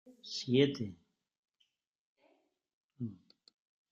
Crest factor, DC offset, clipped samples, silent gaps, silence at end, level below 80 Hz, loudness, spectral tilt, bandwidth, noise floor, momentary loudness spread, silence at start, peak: 24 dB; under 0.1%; under 0.1%; 1.38-1.43 s, 1.87-2.16 s, 2.74-2.89 s; 0.75 s; -78 dBFS; -35 LUFS; -6 dB/octave; 7.6 kHz; -80 dBFS; 15 LU; 0.05 s; -14 dBFS